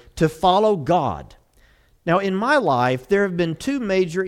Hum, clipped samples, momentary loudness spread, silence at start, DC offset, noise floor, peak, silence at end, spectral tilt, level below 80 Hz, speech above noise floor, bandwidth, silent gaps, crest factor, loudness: none; under 0.1%; 7 LU; 0.15 s; under 0.1%; -56 dBFS; -4 dBFS; 0 s; -6 dB/octave; -48 dBFS; 36 dB; 15 kHz; none; 16 dB; -20 LUFS